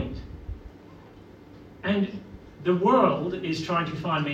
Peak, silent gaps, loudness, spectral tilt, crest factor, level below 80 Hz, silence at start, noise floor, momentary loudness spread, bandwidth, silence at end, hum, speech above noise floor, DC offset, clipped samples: -8 dBFS; none; -26 LUFS; -7 dB/octave; 20 dB; -48 dBFS; 0 s; -48 dBFS; 21 LU; 8.8 kHz; 0 s; none; 24 dB; under 0.1%; under 0.1%